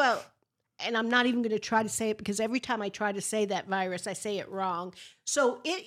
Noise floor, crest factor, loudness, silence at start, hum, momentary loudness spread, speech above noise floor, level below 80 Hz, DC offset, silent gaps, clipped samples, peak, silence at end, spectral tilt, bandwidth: -74 dBFS; 20 dB; -30 LUFS; 0 s; none; 9 LU; 44 dB; -72 dBFS; under 0.1%; none; under 0.1%; -10 dBFS; 0 s; -3 dB/octave; 15.5 kHz